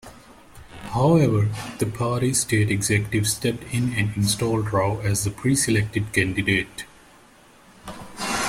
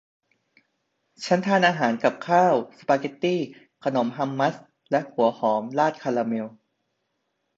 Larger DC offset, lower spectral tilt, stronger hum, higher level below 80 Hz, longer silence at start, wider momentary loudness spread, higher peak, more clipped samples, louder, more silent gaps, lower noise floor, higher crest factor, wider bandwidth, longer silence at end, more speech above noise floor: neither; second, -4.5 dB/octave vs -6 dB/octave; neither; first, -48 dBFS vs -72 dBFS; second, 0.05 s vs 1.2 s; first, 15 LU vs 10 LU; about the same, -6 dBFS vs -6 dBFS; neither; about the same, -22 LUFS vs -24 LUFS; neither; second, -51 dBFS vs -76 dBFS; about the same, 18 dB vs 20 dB; first, 15.5 kHz vs 8 kHz; second, 0 s vs 1.1 s; second, 30 dB vs 53 dB